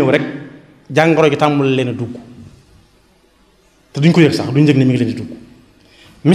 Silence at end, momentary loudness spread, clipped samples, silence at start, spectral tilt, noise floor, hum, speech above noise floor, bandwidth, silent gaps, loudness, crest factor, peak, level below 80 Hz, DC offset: 0 s; 17 LU; under 0.1%; 0 s; -7 dB/octave; -52 dBFS; none; 39 dB; 12 kHz; none; -14 LUFS; 16 dB; 0 dBFS; -54 dBFS; under 0.1%